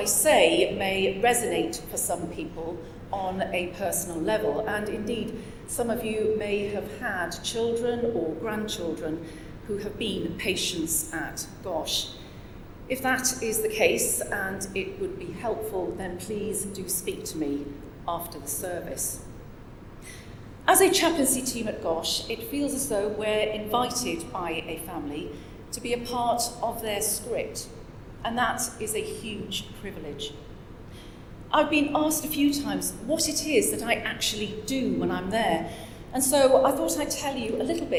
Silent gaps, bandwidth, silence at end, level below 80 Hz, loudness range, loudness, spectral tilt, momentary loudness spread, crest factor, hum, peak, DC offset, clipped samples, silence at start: none; over 20 kHz; 0 s; -48 dBFS; 6 LU; -27 LUFS; -3 dB/octave; 16 LU; 22 dB; none; -6 dBFS; under 0.1%; under 0.1%; 0 s